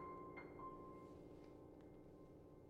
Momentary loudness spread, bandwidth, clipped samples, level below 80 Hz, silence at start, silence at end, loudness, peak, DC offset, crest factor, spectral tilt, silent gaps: 8 LU; 10.5 kHz; under 0.1%; -72 dBFS; 0 s; 0 s; -58 LUFS; -44 dBFS; under 0.1%; 14 dB; -8 dB/octave; none